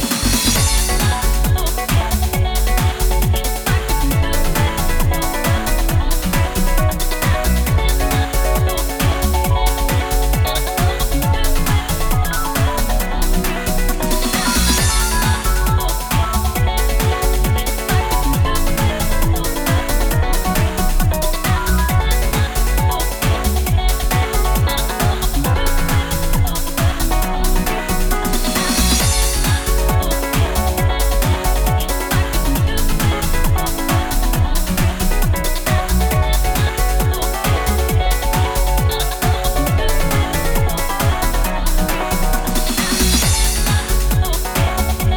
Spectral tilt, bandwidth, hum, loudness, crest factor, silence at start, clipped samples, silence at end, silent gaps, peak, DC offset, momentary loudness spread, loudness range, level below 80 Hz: -4 dB/octave; over 20 kHz; none; -17 LUFS; 14 dB; 0 s; under 0.1%; 0 s; none; -2 dBFS; under 0.1%; 3 LU; 1 LU; -18 dBFS